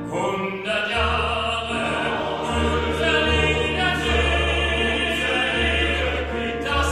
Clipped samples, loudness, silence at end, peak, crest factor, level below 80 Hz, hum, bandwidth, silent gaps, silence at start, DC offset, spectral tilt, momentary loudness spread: under 0.1%; -21 LUFS; 0 s; -6 dBFS; 16 dB; -32 dBFS; none; 13.5 kHz; none; 0 s; under 0.1%; -4.5 dB/octave; 5 LU